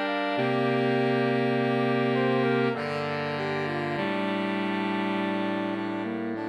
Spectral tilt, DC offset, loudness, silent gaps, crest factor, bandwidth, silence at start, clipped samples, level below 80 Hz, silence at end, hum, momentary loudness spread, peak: -7.5 dB/octave; under 0.1%; -27 LUFS; none; 14 dB; 10 kHz; 0 s; under 0.1%; -72 dBFS; 0 s; none; 5 LU; -14 dBFS